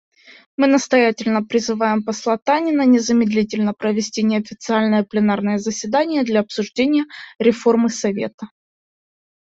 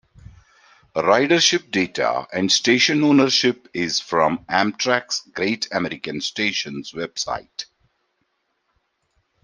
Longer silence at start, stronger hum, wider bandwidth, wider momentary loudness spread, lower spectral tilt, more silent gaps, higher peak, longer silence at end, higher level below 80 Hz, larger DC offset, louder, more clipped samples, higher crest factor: second, 0.6 s vs 0.95 s; neither; second, 8 kHz vs 11 kHz; second, 7 LU vs 14 LU; first, -5 dB/octave vs -3 dB/octave; first, 8.34-8.38 s vs none; about the same, -2 dBFS vs -2 dBFS; second, 1.05 s vs 1.8 s; about the same, -60 dBFS vs -60 dBFS; neither; about the same, -18 LUFS vs -20 LUFS; neither; about the same, 16 dB vs 20 dB